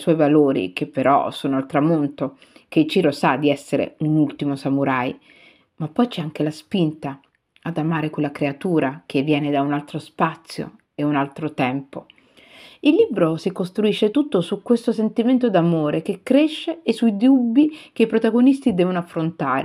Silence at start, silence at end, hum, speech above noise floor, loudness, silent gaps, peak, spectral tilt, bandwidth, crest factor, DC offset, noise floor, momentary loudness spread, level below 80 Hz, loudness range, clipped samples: 0 s; 0 s; none; 28 dB; -20 LUFS; none; -4 dBFS; -7.5 dB/octave; 12 kHz; 16 dB; under 0.1%; -48 dBFS; 10 LU; -66 dBFS; 6 LU; under 0.1%